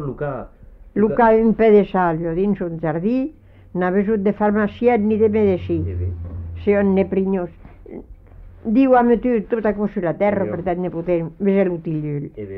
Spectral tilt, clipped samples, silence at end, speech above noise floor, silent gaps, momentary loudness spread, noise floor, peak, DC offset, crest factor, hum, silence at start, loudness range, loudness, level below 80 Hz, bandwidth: -11 dB/octave; under 0.1%; 0 s; 23 dB; none; 14 LU; -41 dBFS; -4 dBFS; under 0.1%; 16 dB; none; 0 s; 3 LU; -19 LUFS; -42 dBFS; 5.2 kHz